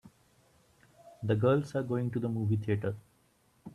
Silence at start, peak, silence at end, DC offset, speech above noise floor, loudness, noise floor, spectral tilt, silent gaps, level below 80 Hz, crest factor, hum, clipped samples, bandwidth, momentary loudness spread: 0.05 s; -16 dBFS; 0.05 s; under 0.1%; 38 dB; -32 LUFS; -69 dBFS; -9 dB/octave; none; -66 dBFS; 18 dB; none; under 0.1%; 11 kHz; 13 LU